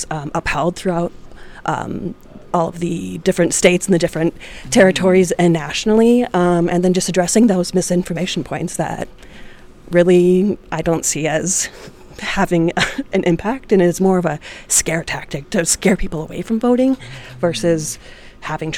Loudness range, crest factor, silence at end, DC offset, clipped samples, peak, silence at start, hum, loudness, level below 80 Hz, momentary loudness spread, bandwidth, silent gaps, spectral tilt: 4 LU; 16 dB; 0 s; under 0.1%; under 0.1%; 0 dBFS; 0 s; none; -17 LUFS; -40 dBFS; 12 LU; 17 kHz; none; -4.5 dB/octave